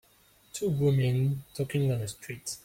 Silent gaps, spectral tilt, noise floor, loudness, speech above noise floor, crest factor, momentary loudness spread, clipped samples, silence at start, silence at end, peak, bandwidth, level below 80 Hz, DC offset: none; -6.5 dB/octave; -62 dBFS; -29 LUFS; 34 dB; 14 dB; 12 LU; under 0.1%; 0.55 s; 0.05 s; -16 dBFS; 16.5 kHz; -60 dBFS; under 0.1%